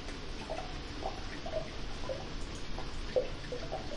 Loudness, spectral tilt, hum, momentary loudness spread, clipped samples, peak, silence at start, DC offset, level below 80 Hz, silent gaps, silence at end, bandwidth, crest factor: -40 LUFS; -4.5 dB/octave; none; 7 LU; under 0.1%; -18 dBFS; 0 s; under 0.1%; -44 dBFS; none; 0 s; 11.5 kHz; 20 dB